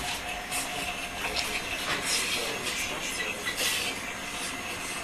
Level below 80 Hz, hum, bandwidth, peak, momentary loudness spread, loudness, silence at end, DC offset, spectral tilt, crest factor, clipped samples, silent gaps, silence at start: -52 dBFS; none; 14 kHz; -12 dBFS; 6 LU; -30 LUFS; 0 s; under 0.1%; -1 dB/octave; 20 dB; under 0.1%; none; 0 s